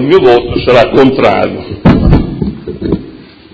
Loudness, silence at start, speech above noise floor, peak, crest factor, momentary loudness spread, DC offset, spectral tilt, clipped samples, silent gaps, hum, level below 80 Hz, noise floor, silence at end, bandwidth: -9 LUFS; 0 s; 24 dB; 0 dBFS; 8 dB; 12 LU; under 0.1%; -8 dB/octave; 2%; none; none; -20 dBFS; -31 dBFS; 0.3 s; 8 kHz